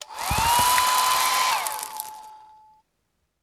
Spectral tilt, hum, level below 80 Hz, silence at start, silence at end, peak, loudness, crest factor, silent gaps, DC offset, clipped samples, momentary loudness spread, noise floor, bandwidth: -0.5 dB/octave; none; -44 dBFS; 0 s; 1.05 s; -4 dBFS; -21 LUFS; 20 dB; none; under 0.1%; under 0.1%; 15 LU; -74 dBFS; over 20 kHz